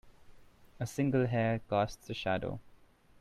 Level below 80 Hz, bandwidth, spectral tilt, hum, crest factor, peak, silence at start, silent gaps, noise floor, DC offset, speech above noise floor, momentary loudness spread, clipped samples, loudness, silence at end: -60 dBFS; 14.5 kHz; -6.5 dB/octave; none; 18 dB; -16 dBFS; 0.05 s; none; -61 dBFS; under 0.1%; 28 dB; 12 LU; under 0.1%; -34 LUFS; 0.45 s